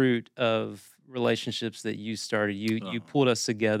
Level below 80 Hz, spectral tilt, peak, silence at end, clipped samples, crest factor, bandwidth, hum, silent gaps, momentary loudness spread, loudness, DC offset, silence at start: -82 dBFS; -5 dB/octave; -10 dBFS; 0 s; under 0.1%; 16 dB; 15.5 kHz; none; none; 9 LU; -28 LUFS; under 0.1%; 0 s